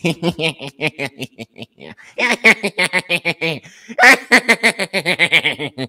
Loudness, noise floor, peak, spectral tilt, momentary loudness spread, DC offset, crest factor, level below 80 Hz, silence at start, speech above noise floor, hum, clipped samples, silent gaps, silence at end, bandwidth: -14 LUFS; -40 dBFS; 0 dBFS; -3 dB/octave; 19 LU; under 0.1%; 18 dB; -60 dBFS; 0.05 s; 18 dB; none; 0.1%; none; 0 s; 19 kHz